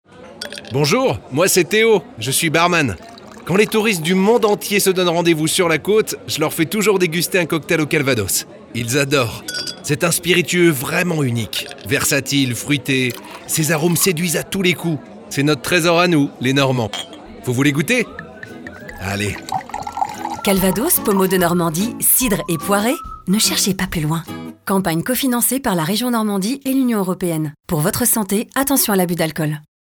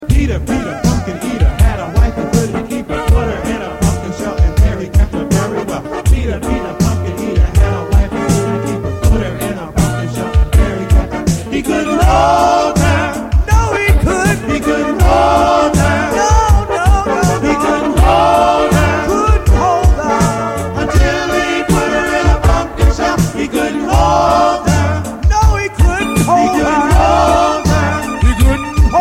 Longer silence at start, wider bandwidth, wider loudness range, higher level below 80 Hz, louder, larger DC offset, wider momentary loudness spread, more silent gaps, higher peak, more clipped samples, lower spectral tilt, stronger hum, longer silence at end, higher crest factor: first, 0.15 s vs 0 s; first, over 20 kHz vs 16 kHz; about the same, 3 LU vs 4 LU; second, -46 dBFS vs -16 dBFS; second, -17 LUFS vs -13 LUFS; neither; first, 10 LU vs 7 LU; neither; about the same, -2 dBFS vs 0 dBFS; neither; second, -4 dB/octave vs -6 dB/octave; neither; first, 0.35 s vs 0 s; about the same, 16 dB vs 12 dB